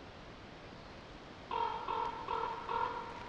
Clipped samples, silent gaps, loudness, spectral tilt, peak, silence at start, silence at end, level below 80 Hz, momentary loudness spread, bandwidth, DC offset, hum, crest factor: under 0.1%; none; -38 LUFS; -5 dB/octave; -24 dBFS; 0 s; 0 s; -60 dBFS; 14 LU; 9 kHz; under 0.1%; none; 18 dB